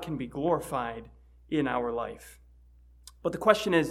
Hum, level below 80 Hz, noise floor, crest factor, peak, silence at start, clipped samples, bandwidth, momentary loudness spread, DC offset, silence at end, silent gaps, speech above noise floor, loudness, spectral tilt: 60 Hz at -55 dBFS; -54 dBFS; -56 dBFS; 24 dB; -6 dBFS; 0 s; under 0.1%; 15.5 kHz; 14 LU; under 0.1%; 0 s; none; 28 dB; -29 LUFS; -5.5 dB/octave